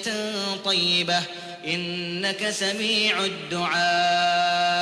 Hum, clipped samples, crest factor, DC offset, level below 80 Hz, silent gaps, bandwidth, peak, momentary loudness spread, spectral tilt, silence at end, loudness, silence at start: none; under 0.1%; 14 dB; under 0.1%; -68 dBFS; none; 11 kHz; -10 dBFS; 7 LU; -2.5 dB/octave; 0 s; -23 LUFS; 0 s